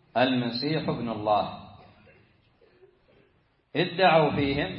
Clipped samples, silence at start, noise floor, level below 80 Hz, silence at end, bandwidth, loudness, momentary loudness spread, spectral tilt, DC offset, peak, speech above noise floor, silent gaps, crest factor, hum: under 0.1%; 0.15 s; -66 dBFS; -54 dBFS; 0 s; 5.8 kHz; -25 LUFS; 11 LU; -10 dB/octave; under 0.1%; -8 dBFS; 41 dB; none; 20 dB; none